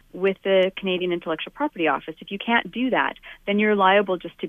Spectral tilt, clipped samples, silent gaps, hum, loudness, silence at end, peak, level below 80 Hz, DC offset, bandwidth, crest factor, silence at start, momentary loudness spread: -7.5 dB/octave; under 0.1%; none; none; -22 LUFS; 0 s; -4 dBFS; -60 dBFS; under 0.1%; 4 kHz; 18 dB; 0.15 s; 10 LU